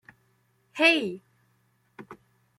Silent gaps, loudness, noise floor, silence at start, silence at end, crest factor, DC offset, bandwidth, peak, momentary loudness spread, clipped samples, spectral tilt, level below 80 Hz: none; -23 LUFS; -68 dBFS; 0.75 s; 0.45 s; 22 dB; under 0.1%; 13 kHz; -8 dBFS; 27 LU; under 0.1%; -3.5 dB/octave; -78 dBFS